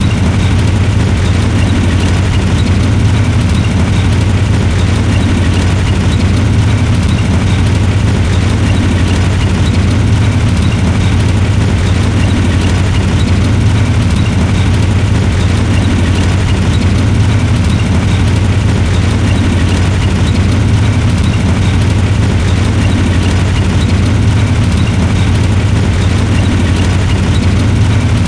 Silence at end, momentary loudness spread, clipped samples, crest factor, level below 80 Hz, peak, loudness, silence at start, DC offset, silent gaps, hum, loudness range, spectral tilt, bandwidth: 0 s; 1 LU; under 0.1%; 8 dB; -18 dBFS; -2 dBFS; -11 LUFS; 0 s; 0.2%; none; none; 0 LU; -6.5 dB/octave; 10.5 kHz